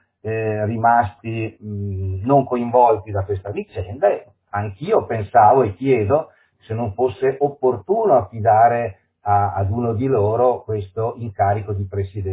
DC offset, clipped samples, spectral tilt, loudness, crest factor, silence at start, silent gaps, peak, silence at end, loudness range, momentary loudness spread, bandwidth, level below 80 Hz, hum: under 0.1%; under 0.1%; -12 dB/octave; -19 LUFS; 16 dB; 0.25 s; none; -2 dBFS; 0 s; 2 LU; 12 LU; 4 kHz; -42 dBFS; none